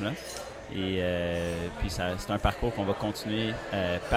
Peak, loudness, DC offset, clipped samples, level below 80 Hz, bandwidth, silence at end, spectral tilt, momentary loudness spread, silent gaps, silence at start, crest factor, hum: -10 dBFS; -31 LUFS; under 0.1%; under 0.1%; -42 dBFS; 16.5 kHz; 0 s; -5.5 dB/octave; 6 LU; none; 0 s; 20 dB; none